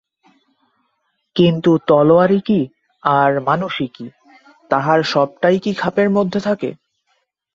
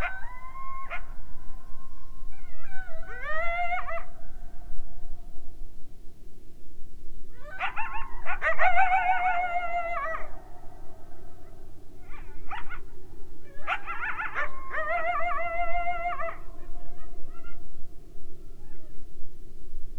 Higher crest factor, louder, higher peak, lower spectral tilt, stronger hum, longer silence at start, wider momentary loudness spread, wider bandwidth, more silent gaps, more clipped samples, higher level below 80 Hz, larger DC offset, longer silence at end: about the same, 18 dB vs 16 dB; first, -16 LUFS vs -30 LUFS; first, 0 dBFS vs -8 dBFS; first, -7 dB/octave vs -5.5 dB/octave; neither; first, 1.35 s vs 0 s; second, 12 LU vs 25 LU; first, 7.6 kHz vs 4 kHz; neither; neither; second, -58 dBFS vs -38 dBFS; neither; first, 0.8 s vs 0 s